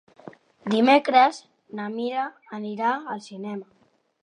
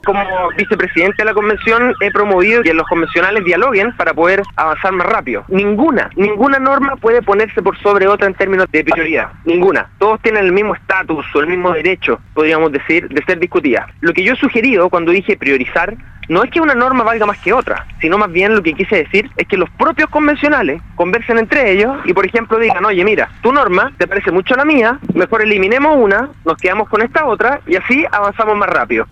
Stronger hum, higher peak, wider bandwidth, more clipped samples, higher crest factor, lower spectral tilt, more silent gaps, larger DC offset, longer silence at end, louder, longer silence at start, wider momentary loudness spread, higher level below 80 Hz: neither; second, -4 dBFS vs 0 dBFS; first, 10.5 kHz vs 8.2 kHz; neither; first, 20 dB vs 12 dB; second, -5 dB/octave vs -6.5 dB/octave; neither; neither; first, 0.6 s vs 0.05 s; second, -23 LUFS vs -12 LUFS; first, 0.25 s vs 0.05 s; first, 19 LU vs 5 LU; second, -78 dBFS vs -40 dBFS